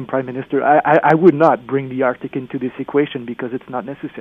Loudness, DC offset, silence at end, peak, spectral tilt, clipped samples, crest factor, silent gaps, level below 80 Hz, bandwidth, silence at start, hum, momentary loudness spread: -17 LUFS; under 0.1%; 0 s; 0 dBFS; -9 dB/octave; under 0.1%; 16 dB; none; -60 dBFS; 6.4 kHz; 0 s; none; 14 LU